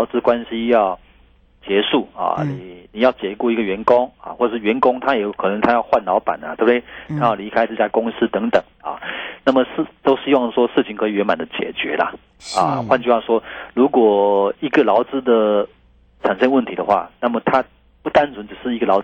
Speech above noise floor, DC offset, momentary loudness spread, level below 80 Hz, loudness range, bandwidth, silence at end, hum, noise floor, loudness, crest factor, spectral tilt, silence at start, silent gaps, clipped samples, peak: 34 dB; under 0.1%; 10 LU; -52 dBFS; 3 LU; 9 kHz; 0 s; none; -52 dBFS; -18 LUFS; 16 dB; -6 dB/octave; 0 s; none; under 0.1%; -2 dBFS